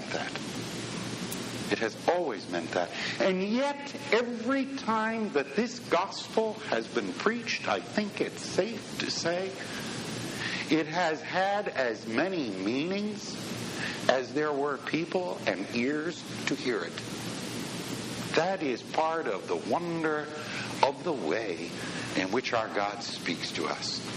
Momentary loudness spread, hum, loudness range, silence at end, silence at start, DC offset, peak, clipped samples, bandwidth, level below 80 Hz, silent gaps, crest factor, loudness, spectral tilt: 7 LU; none; 2 LU; 0 s; 0 s; under 0.1%; -6 dBFS; under 0.1%; 16.5 kHz; -68 dBFS; none; 24 dB; -31 LUFS; -4 dB/octave